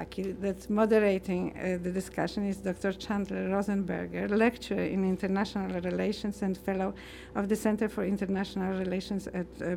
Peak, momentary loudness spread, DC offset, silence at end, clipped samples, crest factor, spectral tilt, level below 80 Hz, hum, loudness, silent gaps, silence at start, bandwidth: -12 dBFS; 8 LU; under 0.1%; 0 s; under 0.1%; 18 dB; -6.5 dB/octave; -54 dBFS; none; -31 LUFS; none; 0 s; 15.5 kHz